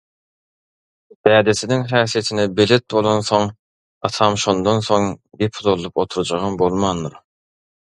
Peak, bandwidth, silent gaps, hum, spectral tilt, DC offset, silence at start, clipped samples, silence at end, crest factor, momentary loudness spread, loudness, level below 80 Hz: 0 dBFS; 11.5 kHz; 3.59-4.01 s; none; -5 dB/octave; under 0.1%; 1.25 s; under 0.1%; 0.85 s; 18 dB; 9 LU; -18 LUFS; -48 dBFS